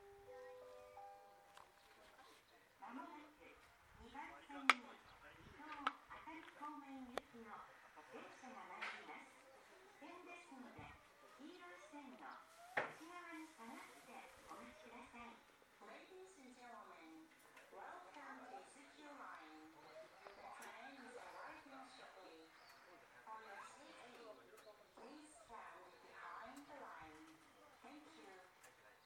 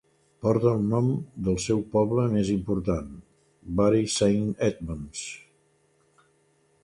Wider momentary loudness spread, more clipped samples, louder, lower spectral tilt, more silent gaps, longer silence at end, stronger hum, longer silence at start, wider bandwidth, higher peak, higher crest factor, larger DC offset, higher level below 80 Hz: about the same, 14 LU vs 13 LU; neither; second, -53 LUFS vs -26 LUFS; second, -2.5 dB/octave vs -6.5 dB/octave; neither; second, 0 s vs 1.45 s; neither; second, 0 s vs 0.4 s; first, 19 kHz vs 11 kHz; second, -12 dBFS vs -8 dBFS; first, 44 dB vs 18 dB; neither; second, -84 dBFS vs -48 dBFS